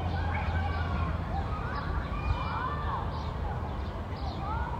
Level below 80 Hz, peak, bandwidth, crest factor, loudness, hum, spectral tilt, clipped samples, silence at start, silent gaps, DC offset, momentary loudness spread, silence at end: -38 dBFS; -16 dBFS; 7.4 kHz; 16 dB; -33 LUFS; none; -7.5 dB/octave; under 0.1%; 0 s; none; under 0.1%; 5 LU; 0 s